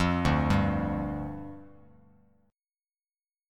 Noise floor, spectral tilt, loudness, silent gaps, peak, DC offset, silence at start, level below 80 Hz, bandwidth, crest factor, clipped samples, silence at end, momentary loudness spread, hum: under -90 dBFS; -7 dB/octave; -28 LUFS; none; -12 dBFS; under 0.1%; 0 s; -42 dBFS; 12.5 kHz; 18 dB; under 0.1%; 1.8 s; 19 LU; none